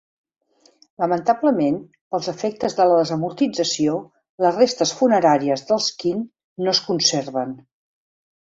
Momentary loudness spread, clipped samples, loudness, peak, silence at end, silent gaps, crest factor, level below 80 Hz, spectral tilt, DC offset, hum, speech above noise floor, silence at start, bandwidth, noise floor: 11 LU; under 0.1%; -20 LUFS; -2 dBFS; 0.9 s; 2.01-2.11 s, 4.29-4.38 s, 6.44-6.56 s; 18 dB; -66 dBFS; -4 dB/octave; under 0.1%; none; 37 dB; 1 s; 7.8 kHz; -57 dBFS